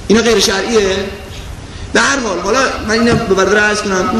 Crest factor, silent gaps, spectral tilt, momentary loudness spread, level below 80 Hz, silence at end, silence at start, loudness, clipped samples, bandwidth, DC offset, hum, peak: 14 dB; none; -3.5 dB/octave; 17 LU; -32 dBFS; 0 s; 0 s; -12 LUFS; under 0.1%; 13.5 kHz; 0.1%; none; 0 dBFS